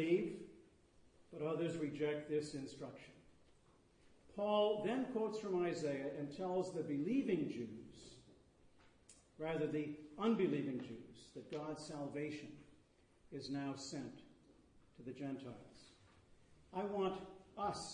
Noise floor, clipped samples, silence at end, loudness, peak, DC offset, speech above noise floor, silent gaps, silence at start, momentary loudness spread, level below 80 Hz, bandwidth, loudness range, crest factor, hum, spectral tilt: -71 dBFS; under 0.1%; 0 s; -42 LUFS; -24 dBFS; under 0.1%; 29 dB; none; 0 s; 18 LU; -74 dBFS; 10 kHz; 9 LU; 20 dB; none; -6 dB/octave